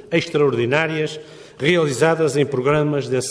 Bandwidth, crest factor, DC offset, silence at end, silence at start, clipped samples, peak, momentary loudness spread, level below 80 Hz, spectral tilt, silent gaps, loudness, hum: 11 kHz; 16 dB; under 0.1%; 0 s; 0.05 s; under 0.1%; -4 dBFS; 6 LU; -56 dBFS; -5.5 dB/octave; none; -19 LUFS; none